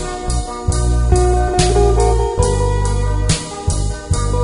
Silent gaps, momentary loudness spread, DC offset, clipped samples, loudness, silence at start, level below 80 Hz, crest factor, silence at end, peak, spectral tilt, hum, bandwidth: none; 8 LU; under 0.1%; under 0.1%; -17 LUFS; 0 s; -18 dBFS; 14 dB; 0 s; 0 dBFS; -5.5 dB/octave; none; 11 kHz